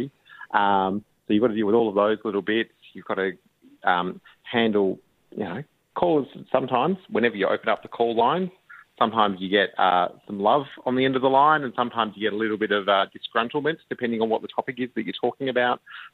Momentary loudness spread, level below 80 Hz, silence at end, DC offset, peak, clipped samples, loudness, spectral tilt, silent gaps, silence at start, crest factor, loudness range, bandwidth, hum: 11 LU; -68 dBFS; 0.05 s; under 0.1%; -4 dBFS; under 0.1%; -24 LUFS; -8 dB/octave; none; 0 s; 20 dB; 4 LU; 4.5 kHz; none